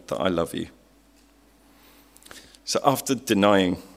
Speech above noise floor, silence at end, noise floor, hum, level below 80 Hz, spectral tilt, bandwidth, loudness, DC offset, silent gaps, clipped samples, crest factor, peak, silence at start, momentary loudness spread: 34 dB; 0.1 s; -57 dBFS; none; -58 dBFS; -4.5 dB/octave; 16 kHz; -23 LUFS; under 0.1%; none; under 0.1%; 22 dB; -4 dBFS; 0.1 s; 24 LU